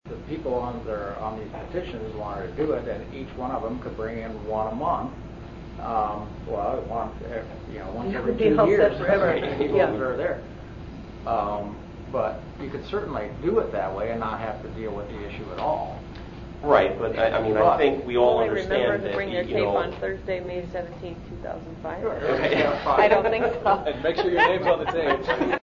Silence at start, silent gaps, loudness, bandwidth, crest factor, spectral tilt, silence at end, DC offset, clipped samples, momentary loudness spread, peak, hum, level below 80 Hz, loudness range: 0.05 s; none; -25 LUFS; 7.4 kHz; 20 dB; -7 dB/octave; 0.05 s; under 0.1%; under 0.1%; 15 LU; -4 dBFS; none; -44 dBFS; 8 LU